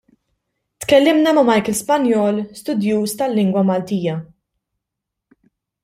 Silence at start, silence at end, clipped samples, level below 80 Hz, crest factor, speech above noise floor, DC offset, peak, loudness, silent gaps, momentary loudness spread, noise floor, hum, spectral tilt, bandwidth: 0.8 s; 1.6 s; under 0.1%; -58 dBFS; 16 dB; 65 dB; under 0.1%; -2 dBFS; -17 LUFS; none; 10 LU; -81 dBFS; none; -5.5 dB/octave; 16 kHz